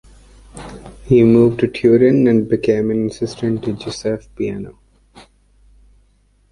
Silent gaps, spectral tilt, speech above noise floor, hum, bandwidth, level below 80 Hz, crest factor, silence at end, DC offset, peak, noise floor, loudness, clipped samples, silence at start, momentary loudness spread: none; -7.5 dB/octave; 41 dB; 50 Hz at -45 dBFS; 11 kHz; -44 dBFS; 16 dB; 1.8 s; under 0.1%; -2 dBFS; -56 dBFS; -16 LUFS; under 0.1%; 0.55 s; 23 LU